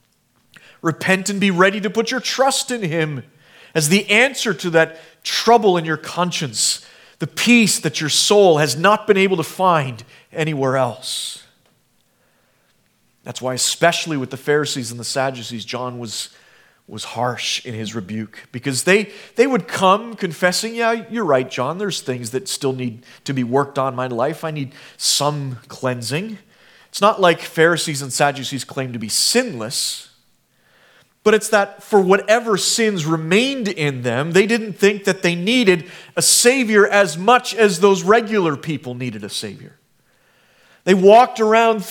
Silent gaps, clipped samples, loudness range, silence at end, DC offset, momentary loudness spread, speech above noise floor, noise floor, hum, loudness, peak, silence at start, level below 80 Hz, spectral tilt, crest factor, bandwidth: none; under 0.1%; 8 LU; 0 s; under 0.1%; 14 LU; 44 dB; -61 dBFS; none; -17 LUFS; 0 dBFS; 0.85 s; -66 dBFS; -3.5 dB/octave; 18 dB; 18.5 kHz